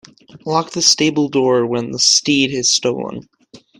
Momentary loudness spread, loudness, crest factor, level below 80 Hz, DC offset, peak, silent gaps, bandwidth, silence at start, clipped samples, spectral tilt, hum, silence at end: 13 LU; -14 LUFS; 18 dB; -58 dBFS; under 0.1%; 0 dBFS; none; 16 kHz; 0.35 s; under 0.1%; -2.5 dB/octave; none; 0.25 s